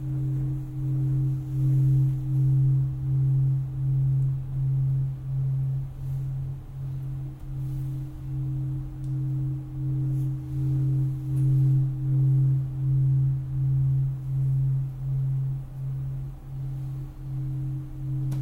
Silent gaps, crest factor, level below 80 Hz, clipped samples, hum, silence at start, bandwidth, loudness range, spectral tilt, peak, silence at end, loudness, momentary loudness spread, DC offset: none; 10 dB; -42 dBFS; under 0.1%; none; 0 s; 1.6 kHz; 8 LU; -10.5 dB/octave; -14 dBFS; 0 s; -27 LUFS; 11 LU; under 0.1%